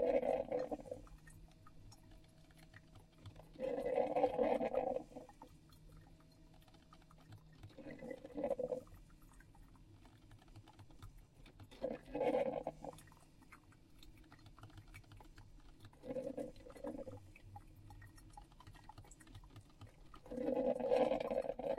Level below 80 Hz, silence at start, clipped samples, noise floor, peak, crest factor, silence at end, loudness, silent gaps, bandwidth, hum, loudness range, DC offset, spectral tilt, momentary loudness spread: -64 dBFS; 0 s; under 0.1%; -63 dBFS; -20 dBFS; 24 dB; 0 s; -41 LUFS; none; 13.5 kHz; none; 15 LU; under 0.1%; -6.5 dB/octave; 27 LU